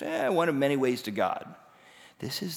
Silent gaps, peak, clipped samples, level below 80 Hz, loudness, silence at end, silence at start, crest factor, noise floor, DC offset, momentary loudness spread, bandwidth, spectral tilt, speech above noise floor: none; -14 dBFS; under 0.1%; -74 dBFS; -28 LUFS; 0 s; 0 s; 16 dB; -55 dBFS; under 0.1%; 13 LU; over 20 kHz; -5 dB/octave; 27 dB